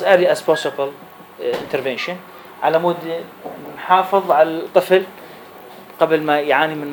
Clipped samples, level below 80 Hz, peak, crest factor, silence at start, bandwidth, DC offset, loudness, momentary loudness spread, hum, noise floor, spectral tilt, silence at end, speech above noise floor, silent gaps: under 0.1%; -68 dBFS; 0 dBFS; 18 dB; 0 s; over 20 kHz; under 0.1%; -18 LUFS; 23 LU; none; -39 dBFS; -5 dB/octave; 0 s; 21 dB; none